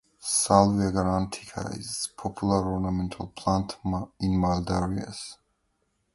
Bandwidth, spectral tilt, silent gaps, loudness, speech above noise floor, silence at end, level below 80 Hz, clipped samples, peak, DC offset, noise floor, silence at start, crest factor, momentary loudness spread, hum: 11.5 kHz; -5.5 dB/octave; none; -27 LUFS; 47 dB; 0.8 s; -44 dBFS; under 0.1%; -4 dBFS; under 0.1%; -74 dBFS; 0.2 s; 24 dB; 14 LU; none